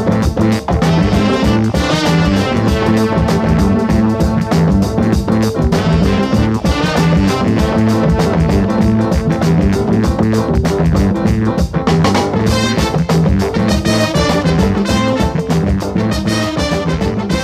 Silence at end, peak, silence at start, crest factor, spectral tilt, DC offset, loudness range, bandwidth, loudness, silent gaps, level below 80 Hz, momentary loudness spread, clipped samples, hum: 0 s; 0 dBFS; 0 s; 12 dB; -6.5 dB/octave; under 0.1%; 1 LU; 15 kHz; -13 LUFS; none; -22 dBFS; 3 LU; under 0.1%; none